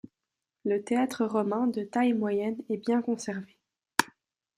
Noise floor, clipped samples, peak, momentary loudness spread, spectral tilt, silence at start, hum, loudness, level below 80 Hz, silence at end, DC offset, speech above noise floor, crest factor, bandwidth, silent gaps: -87 dBFS; under 0.1%; -4 dBFS; 8 LU; -5 dB/octave; 0.65 s; none; -29 LUFS; -74 dBFS; 0.5 s; under 0.1%; 59 dB; 26 dB; 16 kHz; none